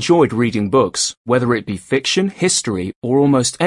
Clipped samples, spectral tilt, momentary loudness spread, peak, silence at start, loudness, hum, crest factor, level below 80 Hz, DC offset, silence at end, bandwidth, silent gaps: under 0.1%; -4.5 dB/octave; 6 LU; -2 dBFS; 0 s; -16 LUFS; none; 14 dB; -54 dBFS; under 0.1%; 0 s; 11.5 kHz; 1.17-1.25 s, 2.96-3.02 s